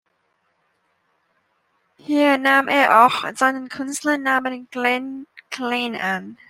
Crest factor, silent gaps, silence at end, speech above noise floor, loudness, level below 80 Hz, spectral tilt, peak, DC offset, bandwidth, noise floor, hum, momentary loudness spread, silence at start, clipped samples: 20 dB; none; 0.15 s; 49 dB; -19 LUFS; -70 dBFS; -3 dB/octave; -2 dBFS; under 0.1%; 16 kHz; -68 dBFS; none; 14 LU; 2.1 s; under 0.1%